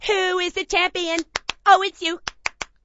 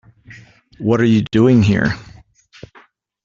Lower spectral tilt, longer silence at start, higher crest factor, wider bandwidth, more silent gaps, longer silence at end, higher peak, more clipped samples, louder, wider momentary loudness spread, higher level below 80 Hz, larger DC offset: second, -1 dB/octave vs -7.5 dB/octave; second, 0 s vs 0.3 s; first, 22 dB vs 16 dB; about the same, 8 kHz vs 7.4 kHz; neither; second, 0.2 s vs 1.2 s; about the same, 0 dBFS vs -2 dBFS; neither; second, -21 LUFS vs -15 LUFS; about the same, 12 LU vs 11 LU; about the same, -50 dBFS vs -46 dBFS; neither